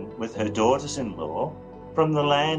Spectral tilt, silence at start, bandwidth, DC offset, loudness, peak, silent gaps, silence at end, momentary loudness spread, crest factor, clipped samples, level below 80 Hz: -5 dB/octave; 0 s; 10 kHz; under 0.1%; -25 LUFS; -8 dBFS; none; 0 s; 11 LU; 18 dB; under 0.1%; -54 dBFS